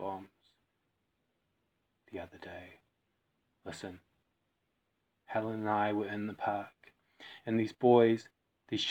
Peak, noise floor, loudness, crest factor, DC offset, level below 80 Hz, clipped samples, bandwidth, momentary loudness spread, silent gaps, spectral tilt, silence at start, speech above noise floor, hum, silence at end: -12 dBFS; -81 dBFS; -32 LUFS; 24 dB; under 0.1%; -82 dBFS; under 0.1%; 9 kHz; 23 LU; none; -6 dB/octave; 0 s; 49 dB; none; 0 s